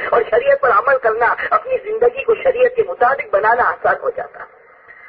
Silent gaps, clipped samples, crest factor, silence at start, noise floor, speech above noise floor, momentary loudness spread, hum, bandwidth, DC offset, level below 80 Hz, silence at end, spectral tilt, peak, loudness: none; under 0.1%; 14 dB; 0 s; -43 dBFS; 28 dB; 7 LU; none; 5 kHz; under 0.1%; -52 dBFS; 0 s; -7.5 dB/octave; -2 dBFS; -15 LUFS